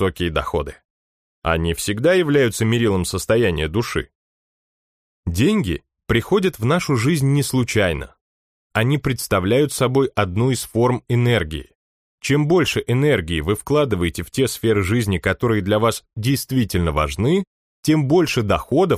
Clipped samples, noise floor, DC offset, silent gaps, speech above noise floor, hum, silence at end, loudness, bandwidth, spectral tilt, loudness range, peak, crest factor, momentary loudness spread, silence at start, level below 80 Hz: under 0.1%; under -90 dBFS; under 0.1%; 0.85-1.42 s, 4.15-5.23 s, 8.21-8.70 s, 11.75-12.18 s, 17.47-17.83 s; over 72 dB; none; 0 s; -19 LUFS; 15.5 kHz; -5.5 dB/octave; 2 LU; -2 dBFS; 18 dB; 8 LU; 0 s; -38 dBFS